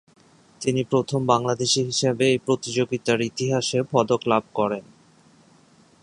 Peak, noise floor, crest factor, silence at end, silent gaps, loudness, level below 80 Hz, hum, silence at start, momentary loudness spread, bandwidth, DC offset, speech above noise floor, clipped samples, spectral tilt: -2 dBFS; -55 dBFS; 22 dB; 1.2 s; none; -23 LUFS; -62 dBFS; none; 0.6 s; 5 LU; 11 kHz; under 0.1%; 33 dB; under 0.1%; -4.5 dB/octave